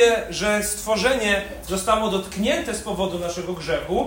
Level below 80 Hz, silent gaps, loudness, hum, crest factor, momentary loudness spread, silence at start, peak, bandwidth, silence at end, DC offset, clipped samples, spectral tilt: -42 dBFS; none; -23 LUFS; none; 20 dB; 8 LU; 0 s; -4 dBFS; 16.5 kHz; 0 s; under 0.1%; under 0.1%; -3.5 dB/octave